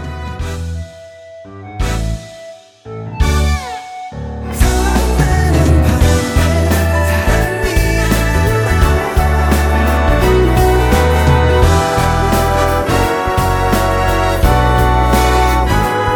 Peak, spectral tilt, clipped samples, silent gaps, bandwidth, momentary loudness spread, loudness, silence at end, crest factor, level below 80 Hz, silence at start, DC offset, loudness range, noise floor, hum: 0 dBFS; -5.5 dB/octave; under 0.1%; none; 19 kHz; 14 LU; -13 LUFS; 0 s; 12 dB; -16 dBFS; 0 s; under 0.1%; 9 LU; -35 dBFS; none